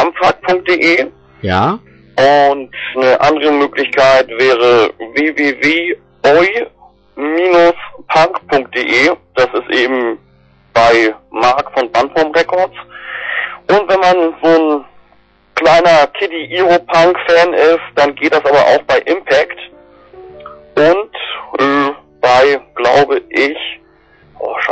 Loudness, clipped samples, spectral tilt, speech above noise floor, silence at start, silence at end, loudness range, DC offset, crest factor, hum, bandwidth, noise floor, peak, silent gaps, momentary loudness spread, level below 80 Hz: -12 LUFS; under 0.1%; -4.5 dB/octave; 38 dB; 0 s; 0 s; 3 LU; under 0.1%; 10 dB; none; 8.4 kHz; -49 dBFS; -2 dBFS; none; 11 LU; -48 dBFS